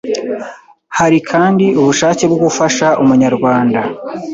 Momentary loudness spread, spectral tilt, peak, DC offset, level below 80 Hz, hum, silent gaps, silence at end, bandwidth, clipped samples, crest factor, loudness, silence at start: 11 LU; -5 dB/octave; 0 dBFS; under 0.1%; -52 dBFS; none; none; 0 s; 8 kHz; under 0.1%; 12 dB; -12 LUFS; 0.05 s